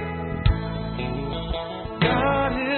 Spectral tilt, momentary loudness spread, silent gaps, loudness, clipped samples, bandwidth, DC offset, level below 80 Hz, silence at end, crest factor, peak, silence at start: -11 dB/octave; 9 LU; none; -25 LUFS; under 0.1%; 4.4 kHz; under 0.1%; -32 dBFS; 0 s; 20 dB; -4 dBFS; 0 s